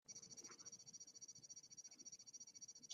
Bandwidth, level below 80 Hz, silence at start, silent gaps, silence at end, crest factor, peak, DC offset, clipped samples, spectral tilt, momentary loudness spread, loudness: 13 kHz; under -90 dBFS; 0.05 s; none; 0 s; 22 dB; -38 dBFS; under 0.1%; under 0.1%; 0 dB/octave; 2 LU; -57 LUFS